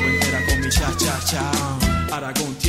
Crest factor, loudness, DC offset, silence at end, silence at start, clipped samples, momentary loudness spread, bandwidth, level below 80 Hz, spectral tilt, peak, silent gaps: 16 dB; -20 LUFS; under 0.1%; 0 s; 0 s; under 0.1%; 5 LU; 16 kHz; -28 dBFS; -3.5 dB/octave; -4 dBFS; none